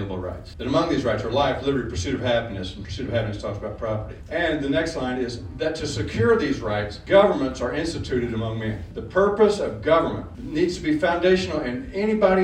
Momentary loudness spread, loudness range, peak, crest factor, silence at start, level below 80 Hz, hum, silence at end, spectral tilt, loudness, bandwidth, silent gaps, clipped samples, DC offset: 11 LU; 4 LU; -4 dBFS; 20 dB; 0 s; -42 dBFS; none; 0 s; -6 dB/octave; -23 LUFS; 10.5 kHz; none; under 0.1%; under 0.1%